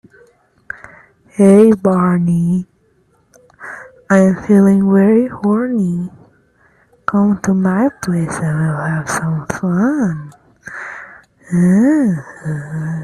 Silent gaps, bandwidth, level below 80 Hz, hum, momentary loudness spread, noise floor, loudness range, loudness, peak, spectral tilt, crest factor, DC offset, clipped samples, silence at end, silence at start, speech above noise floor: none; 12 kHz; -52 dBFS; none; 21 LU; -56 dBFS; 4 LU; -14 LUFS; 0 dBFS; -8 dB/octave; 14 dB; under 0.1%; under 0.1%; 0 s; 0.75 s; 43 dB